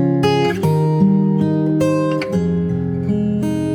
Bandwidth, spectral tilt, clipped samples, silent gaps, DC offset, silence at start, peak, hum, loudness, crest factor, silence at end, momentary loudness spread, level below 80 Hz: 15 kHz; -8 dB/octave; under 0.1%; none; under 0.1%; 0 s; -4 dBFS; none; -17 LUFS; 12 dB; 0 s; 5 LU; -46 dBFS